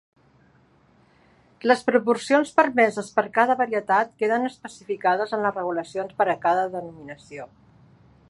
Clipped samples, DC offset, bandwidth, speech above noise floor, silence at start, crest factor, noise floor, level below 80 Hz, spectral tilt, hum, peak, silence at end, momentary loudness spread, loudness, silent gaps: under 0.1%; under 0.1%; 11.5 kHz; 36 dB; 1.65 s; 22 dB; -59 dBFS; -68 dBFS; -5 dB/octave; none; -2 dBFS; 0.85 s; 19 LU; -23 LUFS; none